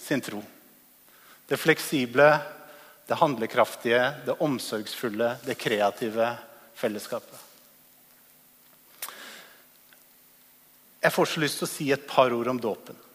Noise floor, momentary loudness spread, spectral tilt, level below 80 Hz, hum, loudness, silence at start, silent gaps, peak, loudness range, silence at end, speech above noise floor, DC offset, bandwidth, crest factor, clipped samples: -57 dBFS; 17 LU; -4 dB/octave; -74 dBFS; none; -26 LUFS; 0 s; none; -4 dBFS; 18 LU; 0.2 s; 31 dB; under 0.1%; 15.5 kHz; 24 dB; under 0.1%